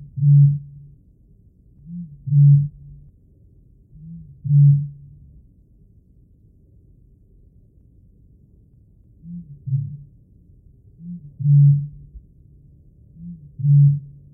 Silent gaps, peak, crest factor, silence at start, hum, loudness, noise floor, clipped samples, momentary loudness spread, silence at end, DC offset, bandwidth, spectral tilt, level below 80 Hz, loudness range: none; -6 dBFS; 16 dB; 0 s; none; -17 LUFS; -52 dBFS; under 0.1%; 26 LU; 0.3 s; under 0.1%; 0.4 kHz; -17 dB/octave; -52 dBFS; 15 LU